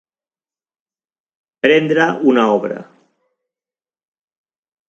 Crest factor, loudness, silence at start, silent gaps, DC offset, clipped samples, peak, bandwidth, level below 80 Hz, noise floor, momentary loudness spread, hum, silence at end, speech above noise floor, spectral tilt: 20 dB; -14 LUFS; 1.65 s; none; under 0.1%; under 0.1%; 0 dBFS; 7.6 kHz; -66 dBFS; under -90 dBFS; 10 LU; none; 2.05 s; over 76 dB; -6 dB/octave